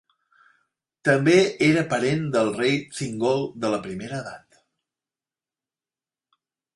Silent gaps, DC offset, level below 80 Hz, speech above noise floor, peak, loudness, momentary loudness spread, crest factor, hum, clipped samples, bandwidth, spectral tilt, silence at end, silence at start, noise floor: none; under 0.1%; -62 dBFS; over 68 dB; -4 dBFS; -22 LUFS; 14 LU; 20 dB; none; under 0.1%; 11.5 kHz; -5.5 dB/octave; 2.4 s; 1.05 s; under -90 dBFS